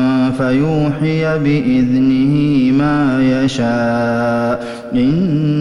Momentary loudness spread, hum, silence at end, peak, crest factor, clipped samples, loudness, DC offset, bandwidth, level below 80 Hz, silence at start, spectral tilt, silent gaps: 3 LU; none; 0 s; -4 dBFS; 10 dB; under 0.1%; -14 LUFS; under 0.1%; 10.5 kHz; -40 dBFS; 0 s; -7.5 dB/octave; none